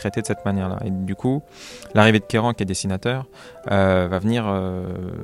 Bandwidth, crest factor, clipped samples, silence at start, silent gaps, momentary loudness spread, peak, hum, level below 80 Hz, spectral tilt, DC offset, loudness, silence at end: 13 kHz; 20 dB; under 0.1%; 0 s; none; 13 LU; 0 dBFS; none; -52 dBFS; -6 dB/octave; under 0.1%; -21 LUFS; 0 s